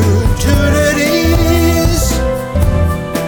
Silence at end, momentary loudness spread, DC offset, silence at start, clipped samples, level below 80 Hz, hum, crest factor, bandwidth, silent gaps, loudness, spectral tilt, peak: 0 s; 4 LU; under 0.1%; 0 s; under 0.1%; -18 dBFS; none; 10 dB; over 20 kHz; none; -13 LUFS; -5.5 dB/octave; 0 dBFS